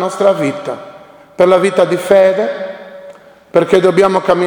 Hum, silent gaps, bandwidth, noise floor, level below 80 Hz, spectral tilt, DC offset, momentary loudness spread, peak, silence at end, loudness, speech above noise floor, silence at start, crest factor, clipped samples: none; none; 19 kHz; -37 dBFS; -54 dBFS; -6 dB/octave; under 0.1%; 16 LU; 0 dBFS; 0 s; -12 LUFS; 26 dB; 0 s; 12 dB; 0.1%